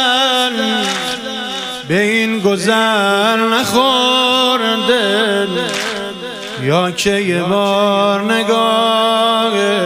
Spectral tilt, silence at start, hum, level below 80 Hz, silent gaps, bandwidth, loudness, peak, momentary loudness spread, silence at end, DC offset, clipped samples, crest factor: -3.5 dB/octave; 0 s; none; -54 dBFS; none; 15.5 kHz; -14 LUFS; 0 dBFS; 9 LU; 0 s; under 0.1%; under 0.1%; 14 dB